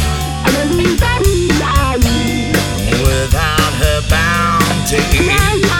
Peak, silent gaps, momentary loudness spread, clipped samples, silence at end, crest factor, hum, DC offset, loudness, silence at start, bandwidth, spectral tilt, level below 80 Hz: 0 dBFS; none; 3 LU; under 0.1%; 0 s; 12 dB; none; under 0.1%; -13 LUFS; 0 s; 18.5 kHz; -4.5 dB/octave; -20 dBFS